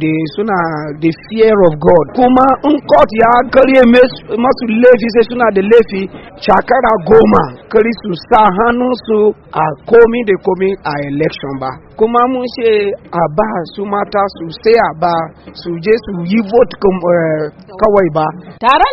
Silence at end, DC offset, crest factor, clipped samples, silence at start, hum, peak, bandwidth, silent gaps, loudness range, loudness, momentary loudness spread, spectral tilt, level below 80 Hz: 0 s; under 0.1%; 10 dB; 0.3%; 0 s; none; 0 dBFS; 5.8 kHz; none; 6 LU; -11 LUFS; 10 LU; -8.5 dB/octave; -38 dBFS